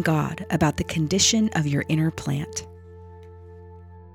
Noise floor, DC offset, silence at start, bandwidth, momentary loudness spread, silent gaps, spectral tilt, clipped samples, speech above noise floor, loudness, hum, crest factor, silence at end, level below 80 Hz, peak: -44 dBFS; under 0.1%; 0 s; 16.5 kHz; 15 LU; none; -4 dB/octave; under 0.1%; 21 dB; -23 LUFS; none; 18 dB; 0 s; -50 dBFS; -6 dBFS